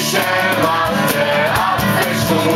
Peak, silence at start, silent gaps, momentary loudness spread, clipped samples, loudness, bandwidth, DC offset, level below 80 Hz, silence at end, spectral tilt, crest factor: -2 dBFS; 0 s; none; 1 LU; under 0.1%; -15 LUFS; 16.5 kHz; under 0.1%; -40 dBFS; 0 s; -4 dB/octave; 12 dB